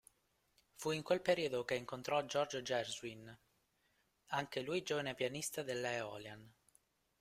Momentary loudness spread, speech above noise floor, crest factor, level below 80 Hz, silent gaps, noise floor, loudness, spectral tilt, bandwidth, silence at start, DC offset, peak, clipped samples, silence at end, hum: 13 LU; 39 dB; 22 dB; -76 dBFS; none; -79 dBFS; -40 LUFS; -3.5 dB/octave; 16 kHz; 0.8 s; under 0.1%; -20 dBFS; under 0.1%; 0.7 s; none